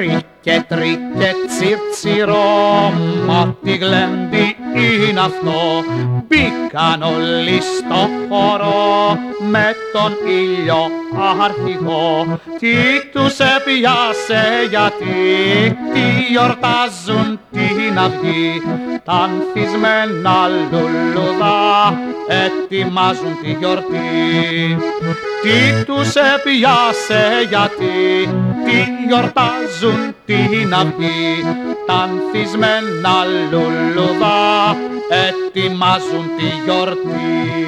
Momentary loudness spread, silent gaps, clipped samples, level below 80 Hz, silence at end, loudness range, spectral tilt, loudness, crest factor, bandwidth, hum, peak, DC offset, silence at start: 6 LU; none; under 0.1%; -50 dBFS; 0 s; 3 LU; -5.5 dB/octave; -14 LUFS; 14 dB; 13 kHz; none; 0 dBFS; under 0.1%; 0 s